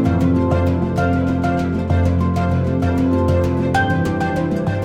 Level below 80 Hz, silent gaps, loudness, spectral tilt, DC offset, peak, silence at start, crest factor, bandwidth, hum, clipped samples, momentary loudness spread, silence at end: -32 dBFS; none; -18 LUFS; -8 dB/octave; under 0.1%; -4 dBFS; 0 s; 12 dB; 10 kHz; none; under 0.1%; 3 LU; 0 s